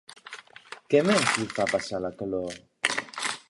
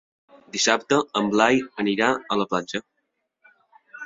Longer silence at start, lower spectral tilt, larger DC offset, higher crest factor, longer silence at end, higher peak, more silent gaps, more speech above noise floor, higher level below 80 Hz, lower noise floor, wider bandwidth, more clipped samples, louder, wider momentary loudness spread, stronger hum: second, 0.1 s vs 0.55 s; about the same, -3.5 dB/octave vs -3 dB/octave; neither; about the same, 22 dB vs 22 dB; about the same, 0.1 s vs 0 s; second, -6 dBFS vs -2 dBFS; neither; second, 21 dB vs 54 dB; about the same, -62 dBFS vs -64 dBFS; second, -47 dBFS vs -76 dBFS; first, 11.5 kHz vs 7.8 kHz; neither; second, -26 LUFS vs -22 LUFS; first, 21 LU vs 11 LU; neither